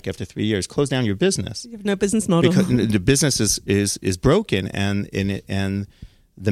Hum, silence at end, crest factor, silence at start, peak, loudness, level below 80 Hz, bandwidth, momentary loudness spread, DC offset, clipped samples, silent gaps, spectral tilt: none; 0 s; 20 dB; 0.05 s; -2 dBFS; -21 LUFS; -42 dBFS; 15 kHz; 9 LU; under 0.1%; under 0.1%; none; -5 dB/octave